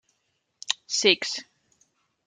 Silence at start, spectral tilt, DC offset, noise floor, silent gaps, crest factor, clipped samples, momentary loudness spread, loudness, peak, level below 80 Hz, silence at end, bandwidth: 0.7 s; -1 dB/octave; under 0.1%; -75 dBFS; none; 26 dB; under 0.1%; 14 LU; -24 LUFS; -2 dBFS; -82 dBFS; 0.85 s; 9.6 kHz